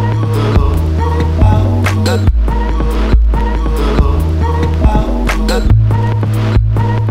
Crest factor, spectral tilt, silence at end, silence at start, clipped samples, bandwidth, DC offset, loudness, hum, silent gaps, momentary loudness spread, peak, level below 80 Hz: 10 dB; -7.5 dB/octave; 0 s; 0 s; 0.4%; 13 kHz; under 0.1%; -13 LUFS; none; none; 4 LU; 0 dBFS; -14 dBFS